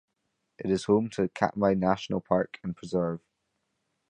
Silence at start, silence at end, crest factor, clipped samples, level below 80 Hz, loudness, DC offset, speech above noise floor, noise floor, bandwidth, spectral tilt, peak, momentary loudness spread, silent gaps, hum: 0.6 s; 0.9 s; 22 dB; under 0.1%; -58 dBFS; -28 LUFS; under 0.1%; 52 dB; -79 dBFS; 9.6 kHz; -7 dB/octave; -6 dBFS; 10 LU; none; none